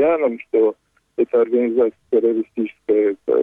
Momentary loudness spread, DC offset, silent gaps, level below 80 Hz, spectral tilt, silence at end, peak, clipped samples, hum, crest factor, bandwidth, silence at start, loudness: 7 LU; under 0.1%; none; -64 dBFS; -8.5 dB/octave; 0 s; -8 dBFS; under 0.1%; none; 10 dB; 3.8 kHz; 0 s; -19 LUFS